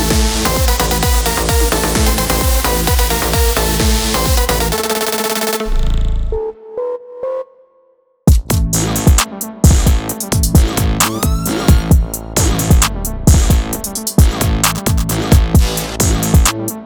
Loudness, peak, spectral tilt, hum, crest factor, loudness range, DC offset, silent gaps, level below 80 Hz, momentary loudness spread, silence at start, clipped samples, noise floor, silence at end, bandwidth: -14 LUFS; 0 dBFS; -4.5 dB/octave; none; 14 dB; 5 LU; under 0.1%; none; -16 dBFS; 8 LU; 0 s; under 0.1%; -54 dBFS; 0 s; over 20 kHz